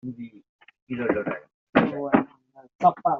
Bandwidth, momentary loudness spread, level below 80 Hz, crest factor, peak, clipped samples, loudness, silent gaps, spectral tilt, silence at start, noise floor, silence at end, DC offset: 6.8 kHz; 15 LU; -60 dBFS; 22 dB; -4 dBFS; under 0.1%; -25 LUFS; 0.49-0.59 s, 0.82-0.87 s, 1.54-1.67 s, 2.75-2.79 s; -5.5 dB/octave; 0.05 s; -51 dBFS; 0 s; under 0.1%